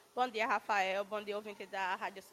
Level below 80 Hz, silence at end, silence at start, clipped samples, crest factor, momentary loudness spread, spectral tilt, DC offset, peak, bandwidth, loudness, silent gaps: -84 dBFS; 0.05 s; 0.15 s; under 0.1%; 18 dB; 10 LU; -3 dB/octave; under 0.1%; -18 dBFS; 15.5 kHz; -36 LUFS; none